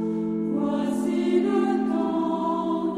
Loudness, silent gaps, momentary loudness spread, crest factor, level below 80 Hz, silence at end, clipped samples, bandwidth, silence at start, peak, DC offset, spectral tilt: -24 LUFS; none; 4 LU; 14 dB; -60 dBFS; 0 s; under 0.1%; 12 kHz; 0 s; -10 dBFS; under 0.1%; -7 dB/octave